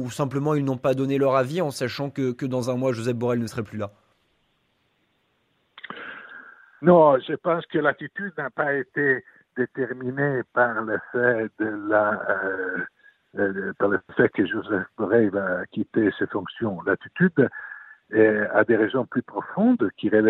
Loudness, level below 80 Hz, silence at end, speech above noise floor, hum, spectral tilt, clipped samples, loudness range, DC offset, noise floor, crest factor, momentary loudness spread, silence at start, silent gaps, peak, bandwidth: -23 LUFS; -66 dBFS; 0 s; 46 dB; none; -7 dB/octave; under 0.1%; 6 LU; under 0.1%; -69 dBFS; 20 dB; 12 LU; 0 s; none; -4 dBFS; 14.5 kHz